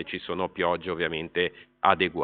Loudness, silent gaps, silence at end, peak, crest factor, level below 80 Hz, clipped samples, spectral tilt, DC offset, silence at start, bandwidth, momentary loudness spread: -27 LUFS; none; 0 s; -4 dBFS; 24 dB; -60 dBFS; under 0.1%; -2 dB/octave; under 0.1%; 0 s; 4.7 kHz; 8 LU